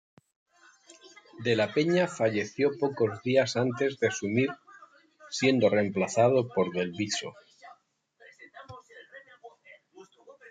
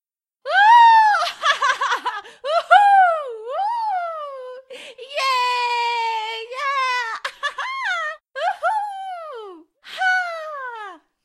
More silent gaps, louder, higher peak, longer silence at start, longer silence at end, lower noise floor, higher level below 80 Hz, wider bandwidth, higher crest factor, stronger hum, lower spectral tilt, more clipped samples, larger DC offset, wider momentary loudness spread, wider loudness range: neither; second, -27 LUFS vs -18 LUFS; second, -10 dBFS vs 0 dBFS; first, 1.05 s vs 0.45 s; second, 0 s vs 0.3 s; first, -65 dBFS vs -40 dBFS; about the same, -74 dBFS vs -76 dBFS; second, 9.4 kHz vs 13 kHz; about the same, 18 dB vs 20 dB; neither; first, -5 dB/octave vs 2 dB/octave; neither; neither; about the same, 23 LU vs 22 LU; about the same, 8 LU vs 9 LU